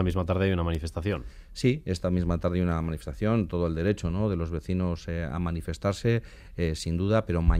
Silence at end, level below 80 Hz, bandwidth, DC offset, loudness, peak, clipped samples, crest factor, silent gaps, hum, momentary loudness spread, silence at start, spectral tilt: 0 s; -38 dBFS; 14 kHz; under 0.1%; -28 LUFS; -10 dBFS; under 0.1%; 18 dB; none; none; 6 LU; 0 s; -7.5 dB/octave